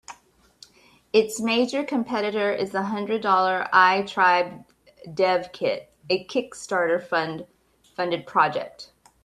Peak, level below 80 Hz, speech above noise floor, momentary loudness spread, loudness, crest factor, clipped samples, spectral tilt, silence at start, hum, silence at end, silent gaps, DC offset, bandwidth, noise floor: -4 dBFS; -68 dBFS; 35 dB; 12 LU; -23 LUFS; 20 dB; under 0.1%; -4 dB/octave; 0.1 s; none; 0.4 s; none; under 0.1%; 13.5 kHz; -58 dBFS